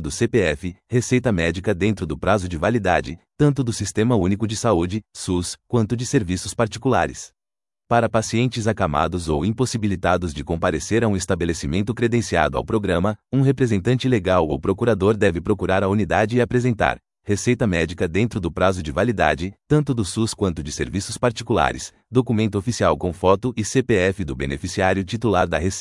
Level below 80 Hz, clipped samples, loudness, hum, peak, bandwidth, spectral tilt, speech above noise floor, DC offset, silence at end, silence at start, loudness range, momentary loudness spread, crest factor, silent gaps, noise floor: -42 dBFS; under 0.1%; -21 LUFS; none; 0 dBFS; 12 kHz; -6 dB/octave; over 70 dB; under 0.1%; 0 s; 0 s; 2 LU; 5 LU; 20 dB; none; under -90 dBFS